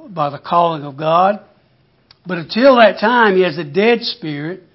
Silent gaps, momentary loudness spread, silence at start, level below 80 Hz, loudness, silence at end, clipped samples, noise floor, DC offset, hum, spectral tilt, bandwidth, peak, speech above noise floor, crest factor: none; 14 LU; 0.05 s; -64 dBFS; -14 LUFS; 0.2 s; under 0.1%; -56 dBFS; under 0.1%; none; -9 dB/octave; 5.8 kHz; 0 dBFS; 41 dB; 16 dB